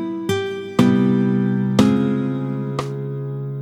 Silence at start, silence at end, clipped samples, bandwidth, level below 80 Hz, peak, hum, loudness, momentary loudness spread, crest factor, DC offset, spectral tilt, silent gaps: 0 s; 0 s; under 0.1%; 13.5 kHz; -54 dBFS; 0 dBFS; none; -20 LUFS; 11 LU; 18 dB; under 0.1%; -7.5 dB/octave; none